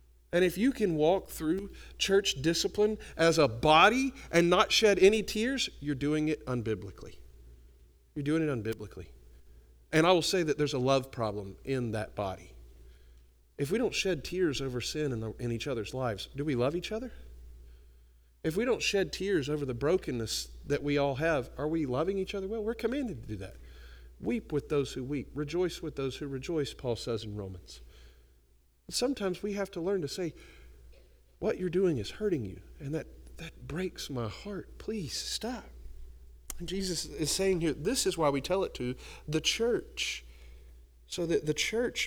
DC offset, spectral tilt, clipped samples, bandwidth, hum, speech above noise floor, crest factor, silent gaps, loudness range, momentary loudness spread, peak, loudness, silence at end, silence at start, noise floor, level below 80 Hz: under 0.1%; -4.5 dB/octave; under 0.1%; over 20 kHz; none; 34 dB; 24 dB; none; 10 LU; 15 LU; -8 dBFS; -31 LUFS; 0 s; 0.35 s; -65 dBFS; -52 dBFS